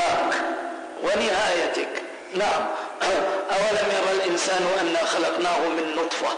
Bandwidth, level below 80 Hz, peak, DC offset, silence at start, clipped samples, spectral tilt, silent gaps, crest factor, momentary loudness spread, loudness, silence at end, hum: 10 kHz; -60 dBFS; -14 dBFS; under 0.1%; 0 s; under 0.1%; -2.5 dB/octave; none; 10 dB; 7 LU; -24 LUFS; 0 s; none